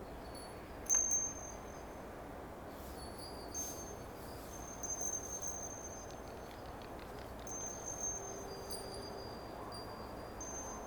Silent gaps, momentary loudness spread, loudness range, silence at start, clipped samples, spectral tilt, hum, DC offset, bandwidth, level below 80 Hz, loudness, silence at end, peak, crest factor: none; 13 LU; 7 LU; 0 s; under 0.1%; -2.5 dB/octave; none; under 0.1%; over 20 kHz; -56 dBFS; -42 LUFS; 0 s; -20 dBFS; 24 dB